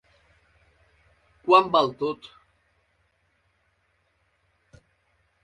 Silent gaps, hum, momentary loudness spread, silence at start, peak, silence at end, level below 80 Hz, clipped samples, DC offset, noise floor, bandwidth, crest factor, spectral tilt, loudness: none; none; 21 LU; 1.45 s; -4 dBFS; 3.3 s; -68 dBFS; under 0.1%; under 0.1%; -70 dBFS; 9.6 kHz; 26 dB; -5.5 dB/octave; -22 LUFS